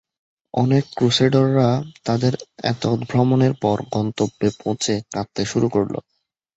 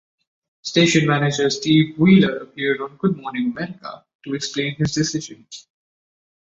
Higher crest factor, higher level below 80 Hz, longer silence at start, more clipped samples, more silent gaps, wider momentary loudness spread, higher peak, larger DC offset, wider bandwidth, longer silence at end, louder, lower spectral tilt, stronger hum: about the same, 18 dB vs 18 dB; about the same, -52 dBFS vs -56 dBFS; about the same, 0.55 s vs 0.65 s; neither; second, none vs 4.15-4.19 s; second, 9 LU vs 20 LU; about the same, -4 dBFS vs -2 dBFS; neither; about the same, 8.2 kHz vs 8 kHz; second, 0.55 s vs 0.9 s; about the same, -20 LUFS vs -19 LUFS; about the same, -6 dB/octave vs -5 dB/octave; neither